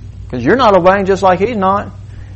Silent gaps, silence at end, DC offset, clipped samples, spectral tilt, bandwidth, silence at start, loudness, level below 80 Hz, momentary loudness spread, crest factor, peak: none; 0 s; under 0.1%; under 0.1%; -6.5 dB/octave; 8.4 kHz; 0 s; -11 LUFS; -34 dBFS; 17 LU; 12 dB; 0 dBFS